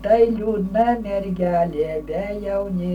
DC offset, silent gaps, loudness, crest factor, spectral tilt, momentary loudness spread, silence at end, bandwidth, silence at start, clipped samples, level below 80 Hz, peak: under 0.1%; none; -21 LUFS; 16 dB; -9 dB/octave; 8 LU; 0 s; 10 kHz; 0 s; under 0.1%; -40 dBFS; -6 dBFS